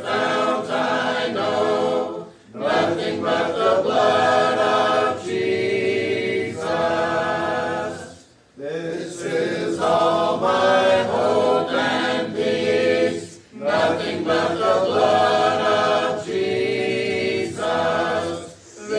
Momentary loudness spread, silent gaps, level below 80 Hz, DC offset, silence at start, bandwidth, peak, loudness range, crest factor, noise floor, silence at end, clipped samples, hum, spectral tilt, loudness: 11 LU; none; -62 dBFS; under 0.1%; 0 s; 10.5 kHz; -6 dBFS; 4 LU; 16 dB; -46 dBFS; 0 s; under 0.1%; none; -4.5 dB/octave; -20 LUFS